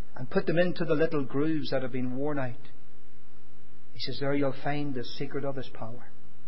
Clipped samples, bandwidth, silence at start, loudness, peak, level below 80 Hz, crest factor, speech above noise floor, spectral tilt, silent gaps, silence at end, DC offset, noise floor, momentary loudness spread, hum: under 0.1%; 5.8 kHz; 0 s; -31 LUFS; -10 dBFS; -64 dBFS; 20 dB; 27 dB; -10.5 dB/octave; none; 0.15 s; 6%; -58 dBFS; 12 LU; none